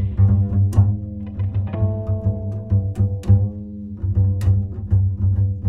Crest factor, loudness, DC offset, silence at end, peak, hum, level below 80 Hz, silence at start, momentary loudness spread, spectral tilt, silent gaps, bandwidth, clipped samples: 16 dB; -20 LUFS; under 0.1%; 0 s; -4 dBFS; none; -32 dBFS; 0 s; 9 LU; -10.5 dB/octave; none; 2.1 kHz; under 0.1%